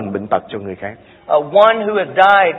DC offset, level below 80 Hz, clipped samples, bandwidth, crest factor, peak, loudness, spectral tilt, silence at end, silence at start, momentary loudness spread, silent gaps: under 0.1%; -58 dBFS; under 0.1%; 6 kHz; 14 dB; 0 dBFS; -14 LUFS; -6.5 dB/octave; 0 s; 0 s; 17 LU; none